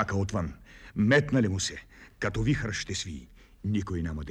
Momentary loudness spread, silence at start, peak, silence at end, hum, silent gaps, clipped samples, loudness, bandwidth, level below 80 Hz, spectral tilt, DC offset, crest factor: 16 LU; 0 s; -10 dBFS; 0 s; none; none; under 0.1%; -29 LUFS; 11 kHz; -46 dBFS; -5.5 dB/octave; under 0.1%; 18 dB